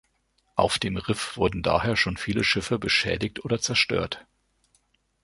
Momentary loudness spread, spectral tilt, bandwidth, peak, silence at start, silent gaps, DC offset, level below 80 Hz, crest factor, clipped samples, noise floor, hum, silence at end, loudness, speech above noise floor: 7 LU; -4 dB/octave; 11.5 kHz; -6 dBFS; 0.55 s; none; under 0.1%; -46 dBFS; 22 dB; under 0.1%; -70 dBFS; none; 1 s; -25 LUFS; 44 dB